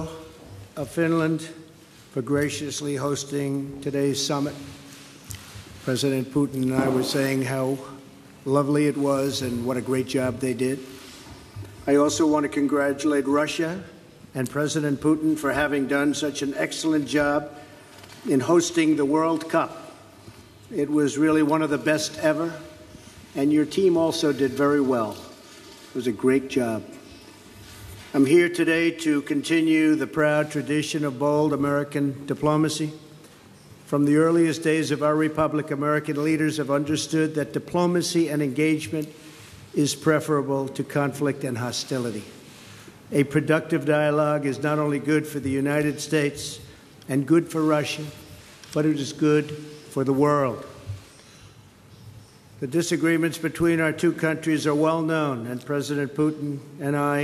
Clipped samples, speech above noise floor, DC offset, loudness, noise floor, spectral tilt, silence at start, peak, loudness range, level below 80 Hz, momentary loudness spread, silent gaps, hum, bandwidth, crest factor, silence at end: under 0.1%; 27 dB; under 0.1%; -24 LUFS; -49 dBFS; -5.5 dB/octave; 0 s; -6 dBFS; 4 LU; -60 dBFS; 19 LU; none; none; 14.5 kHz; 18 dB; 0 s